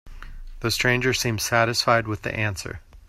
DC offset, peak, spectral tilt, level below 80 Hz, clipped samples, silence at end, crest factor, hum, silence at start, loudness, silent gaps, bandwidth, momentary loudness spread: under 0.1%; -6 dBFS; -3.5 dB/octave; -42 dBFS; under 0.1%; 0.1 s; 20 dB; none; 0.05 s; -22 LUFS; none; 16 kHz; 10 LU